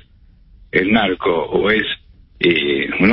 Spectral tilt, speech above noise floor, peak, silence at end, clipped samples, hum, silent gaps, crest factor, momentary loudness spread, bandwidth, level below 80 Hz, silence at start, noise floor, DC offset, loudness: -10.5 dB/octave; 32 dB; -2 dBFS; 0 s; under 0.1%; none; none; 16 dB; 5 LU; 5.6 kHz; -44 dBFS; 0.75 s; -48 dBFS; under 0.1%; -17 LUFS